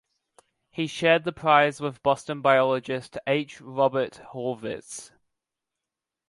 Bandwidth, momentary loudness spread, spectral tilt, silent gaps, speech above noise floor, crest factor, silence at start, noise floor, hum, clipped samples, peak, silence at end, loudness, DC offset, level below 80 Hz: 11.5 kHz; 14 LU; -5 dB/octave; none; 63 dB; 22 dB; 0.75 s; -87 dBFS; none; under 0.1%; -4 dBFS; 1.25 s; -25 LUFS; under 0.1%; -66 dBFS